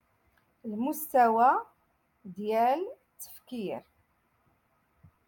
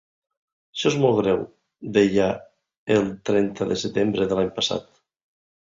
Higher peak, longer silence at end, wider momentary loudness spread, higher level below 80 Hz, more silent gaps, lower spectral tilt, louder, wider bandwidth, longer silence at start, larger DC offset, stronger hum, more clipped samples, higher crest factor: second, -12 dBFS vs -4 dBFS; first, 1.5 s vs 0.85 s; first, 22 LU vs 14 LU; second, -76 dBFS vs -56 dBFS; second, none vs 2.77-2.87 s; about the same, -5 dB/octave vs -5.5 dB/octave; second, -28 LUFS vs -22 LUFS; first, 17.5 kHz vs 7.8 kHz; about the same, 0.65 s vs 0.75 s; neither; neither; neither; about the same, 20 dB vs 18 dB